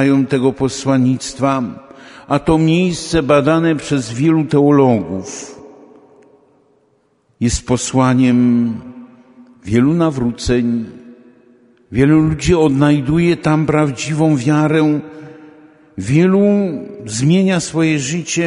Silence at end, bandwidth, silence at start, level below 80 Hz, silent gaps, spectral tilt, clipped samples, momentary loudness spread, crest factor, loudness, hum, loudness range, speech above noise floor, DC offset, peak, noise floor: 0 s; 11 kHz; 0 s; -38 dBFS; none; -6 dB/octave; under 0.1%; 12 LU; 14 dB; -15 LUFS; none; 4 LU; 45 dB; under 0.1%; 0 dBFS; -59 dBFS